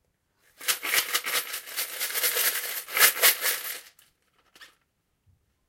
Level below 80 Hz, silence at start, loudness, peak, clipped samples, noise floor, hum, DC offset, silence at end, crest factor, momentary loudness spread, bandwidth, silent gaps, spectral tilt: -76 dBFS; 0.6 s; -24 LUFS; -4 dBFS; under 0.1%; -74 dBFS; none; under 0.1%; 1 s; 26 dB; 13 LU; 17 kHz; none; 2.5 dB/octave